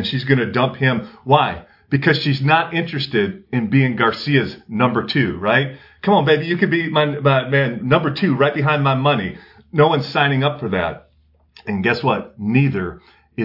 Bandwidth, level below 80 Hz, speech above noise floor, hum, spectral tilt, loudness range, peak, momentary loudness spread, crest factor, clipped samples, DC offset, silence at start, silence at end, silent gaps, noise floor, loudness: 5.8 kHz; -54 dBFS; 39 dB; none; -8.5 dB/octave; 3 LU; 0 dBFS; 9 LU; 18 dB; under 0.1%; under 0.1%; 0 s; 0 s; none; -56 dBFS; -18 LUFS